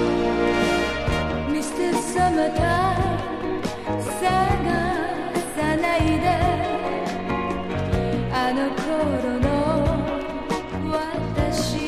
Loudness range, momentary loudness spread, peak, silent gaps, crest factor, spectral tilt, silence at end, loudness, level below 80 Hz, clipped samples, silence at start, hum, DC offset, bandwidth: 2 LU; 6 LU; -6 dBFS; none; 16 dB; -5.5 dB/octave; 0 s; -23 LUFS; -34 dBFS; under 0.1%; 0 s; none; under 0.1%; 15 kHz